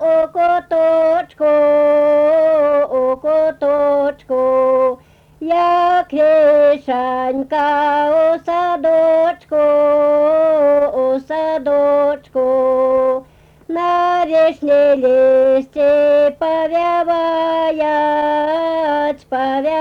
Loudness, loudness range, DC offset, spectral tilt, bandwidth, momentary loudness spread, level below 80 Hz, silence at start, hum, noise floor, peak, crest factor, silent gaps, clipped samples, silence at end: -14 LUFS; 2 LU; under 0.1%; -5.5 dB/octave; 6.4 kHz; 6 LU; -54 dBFS; 0 s; none; -43 dBFS; -6 dBFS; 8 dB; none; under 0.1%; 0 s